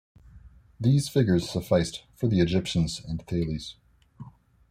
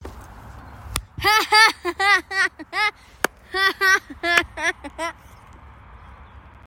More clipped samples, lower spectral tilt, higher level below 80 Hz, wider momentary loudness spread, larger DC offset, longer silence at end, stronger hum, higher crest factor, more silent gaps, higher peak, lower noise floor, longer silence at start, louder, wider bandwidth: neither; first, -6.5 dB/octave vs -1.5 dB/octave; about the same, -48 dBFS vs -46 dBFS; second, 10 LU vs 16 LU; neither; about the same, 0.4 s vs 0.3 s; neither; about the same, 18 dB vs 22 dB; neither; second, -8 dBFS vs 0 dBFS; first, -51 dBFS vs -45 dBFS; first, 0.35 s vs 0 s; second, -26 LUFS vs -19 LUFS; about the same, 15 kHz vs 16.5 kHz